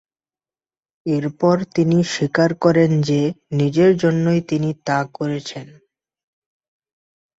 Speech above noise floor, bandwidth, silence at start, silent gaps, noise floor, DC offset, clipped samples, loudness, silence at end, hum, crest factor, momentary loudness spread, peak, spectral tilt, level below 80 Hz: over 72 dB; 8 kHz; 1.05 s; none; under -90 dBFS; under 0.1%; under 0.1%; -18 LUFS; 1.75 s; none; 18 dB; 10 LU; -2 dBFS; -7 dB/octave; -58 dBFS